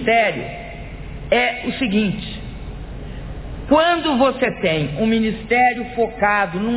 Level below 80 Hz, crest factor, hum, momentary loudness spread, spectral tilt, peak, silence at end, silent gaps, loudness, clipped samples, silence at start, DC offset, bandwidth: -36 dBFS; 16 dB; none; 17 LU; -9.5 dB/octave; -2 dBFS; 0 s; none; -18 LUFS; under 0.1%; 0 s; under 0.1%; 4 kHz